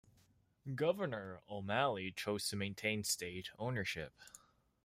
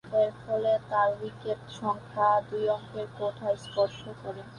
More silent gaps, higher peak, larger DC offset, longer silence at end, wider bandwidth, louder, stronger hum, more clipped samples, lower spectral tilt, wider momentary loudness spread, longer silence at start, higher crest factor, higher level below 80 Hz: neither; second, -20 dBFS vs -12 dBFS; neither; first, 0.45 s vs 0 s; first, 16 kHz vs 10.5 kHz; second, -39 LUFS vs -29 LUFS; neither; neither; second, -4 dB/octave vs -6 dB/octave; about the same, 12 LU vs 11 LU; first, 0.65 s vs 0.05 s; about the same, 20 dB vs 16 dB; second, -72 dBFS vs -64 dBFS